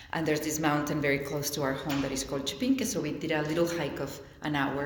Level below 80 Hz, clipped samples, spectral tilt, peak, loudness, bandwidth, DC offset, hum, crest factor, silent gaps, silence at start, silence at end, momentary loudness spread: -54 dBFS; under 0.1%; -4.5 dB/octave; -14 dBFS; -30 LUFS; 19 kHz; under 0.1%; none; 18 dB; none; 0 s; 0 s; 5 LU